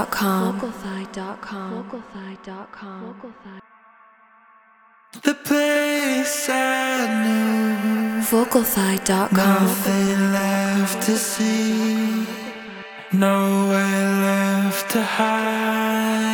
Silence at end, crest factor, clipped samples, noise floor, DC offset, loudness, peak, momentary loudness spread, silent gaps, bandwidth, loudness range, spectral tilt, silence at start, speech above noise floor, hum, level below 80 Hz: 0 s; 20 dB; under 0.1%; -54 dBFS; under 0.1%; -20 LUFS; -2 dBFS; 17 LU; none; over 20 kHz; 15 LU; -4.5 dB/octave; 0 s; 33 dB; none; -60 dBFS